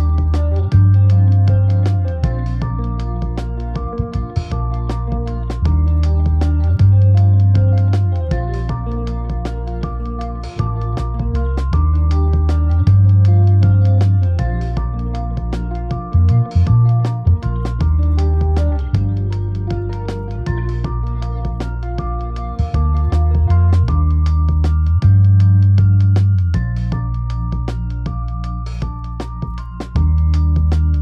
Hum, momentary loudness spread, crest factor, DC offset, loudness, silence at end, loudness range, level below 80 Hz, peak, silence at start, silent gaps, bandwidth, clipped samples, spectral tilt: none; 12 LU; 12 dB; under 0.1%; -16 LUFS; 0 s; 8 LU; -20 dBFS; -2 dBFS; 0 s; none; 5.8 kHz; under 0.1%; -9.5 dB/octave